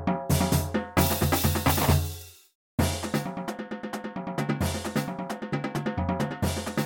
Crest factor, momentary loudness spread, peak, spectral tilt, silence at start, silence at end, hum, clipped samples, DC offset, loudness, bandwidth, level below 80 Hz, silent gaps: 20 dB; 11 LU; -8 dBFS; -5 dB/octave; 0 s; 0 s; none; under 0.1%; under 0.1%; -28 LUFS; 17 kHz; -40 dBFS; 2.55-2.78 s